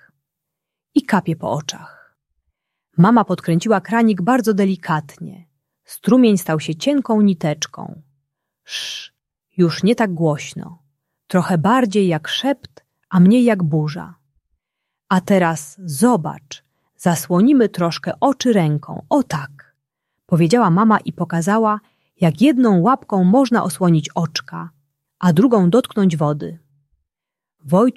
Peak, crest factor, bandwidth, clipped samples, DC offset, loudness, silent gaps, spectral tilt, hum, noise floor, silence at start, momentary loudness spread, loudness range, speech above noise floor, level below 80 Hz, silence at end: -2 dBFS; 16 dB; 13.5 kHz; under 0.1%; under 0.1%; -17 LUFS; none; -6.5 dB/octave; none; -86 dBFS; 0.95 s; 15 LU; 5 LU; 70 dB; -60 dBFS; 0.05 s